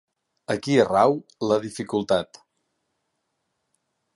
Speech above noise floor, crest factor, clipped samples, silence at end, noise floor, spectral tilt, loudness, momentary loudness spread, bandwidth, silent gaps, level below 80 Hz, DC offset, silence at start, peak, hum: 54 dB; 20 dB; under 0.1%; 1.9 s; -77 dBFS; -5.5 dB/octave; -23 LUFS; 11 LU; 11.5 kHz; none; -62 dBFS; under 0.1%; 0.5 s; -4 dBFS; none